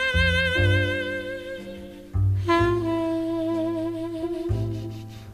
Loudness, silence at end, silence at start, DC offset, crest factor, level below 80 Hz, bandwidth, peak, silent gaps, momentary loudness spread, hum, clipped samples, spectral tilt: -25 LUFS; 0 s; 0 s; under 0.1%; 16 dB; -38 dBFS; 13.5 kHz; -10 dBFS; none; 15 LU; none; under 0.1%; -6.5 dB/octave